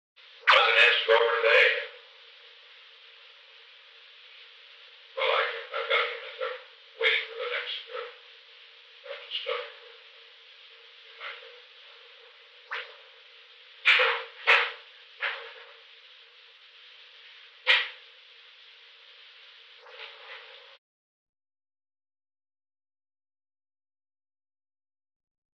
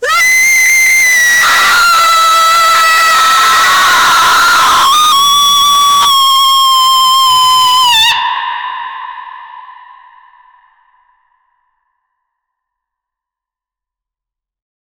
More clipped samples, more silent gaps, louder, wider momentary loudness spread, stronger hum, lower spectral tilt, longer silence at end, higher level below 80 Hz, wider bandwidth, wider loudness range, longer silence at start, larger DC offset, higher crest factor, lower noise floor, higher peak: neither; neither; second, -24 LUFS vs -6 LUFS; first, 29 LU vs 9 LU; neither; about the same, 2 dB/octave vs 2 dB/octave; second, 5.05 s vs 5.3 s; second, under -90 dBFS vs -46 dBFS; second, 9.6 kHz vs over 20 kHz; first, 21 LU vs 8 LU; first, 0.45 s vs 0 s; neither; first, 24 dB vs 10 dB; second, -54 dBFS vs -85 dBFS; second, -8 dBFS vs 0 dBFS